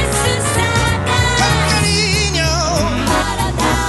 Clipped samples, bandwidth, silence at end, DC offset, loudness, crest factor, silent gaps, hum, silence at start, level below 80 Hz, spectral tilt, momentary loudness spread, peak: under 0.1%; 12.5 kHz; 0 s; under 0.1%; -15 LUFS; 14 dB; none; none; 0 s; -24 dBFS; -3.5 dB/octave; 3 LU; 0 dBFS